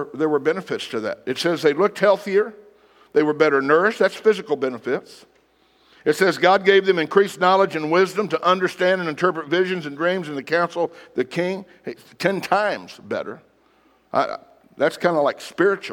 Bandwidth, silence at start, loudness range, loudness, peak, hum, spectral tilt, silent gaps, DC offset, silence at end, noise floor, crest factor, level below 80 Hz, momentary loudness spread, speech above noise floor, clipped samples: 16 kHz; 0 s; 7 LU; -20 LUFS; -2 dBFS; none; -5 dB/octave; none; under 0.1%; 0 s; -59 dBFS; 20 dB; -72 dBFS; 10 LU; 39 dB; under 0.1%